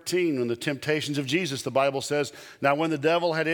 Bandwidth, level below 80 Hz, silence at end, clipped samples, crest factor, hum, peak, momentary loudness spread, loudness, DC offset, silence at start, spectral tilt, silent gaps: 19.5 kHz; -72 dBFS; 0 s; under 0.1%; 20 dB; none; -6 dBFS; 5 LU; -26 LUFS; under 0.1%; 0.05 s; -4.5 dB/octave; none